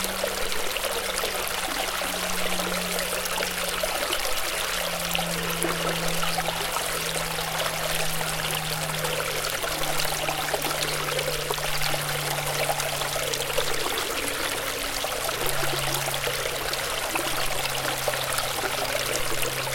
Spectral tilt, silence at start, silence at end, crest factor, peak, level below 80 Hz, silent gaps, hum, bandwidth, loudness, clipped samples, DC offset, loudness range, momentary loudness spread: -2 dB/octave; 0 s; 0 s; 22 dB; -4 dBFS; -44 dBFS; none; none; 17 kHz; -26 LUFS; under 0.1%; under 0.1%; 0 LU; 1 LU